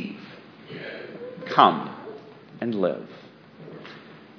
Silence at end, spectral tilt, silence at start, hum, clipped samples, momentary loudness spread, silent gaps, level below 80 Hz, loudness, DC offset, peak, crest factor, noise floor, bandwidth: 0.05 s; -6.5 dB/octave; 0 s; none; under 0.1%; 26 LU; none; -80 dBFS; -24 LUFS; under 0.1%; -2 dBFS; 26 dB; -46 dBFS; 5.4 kHz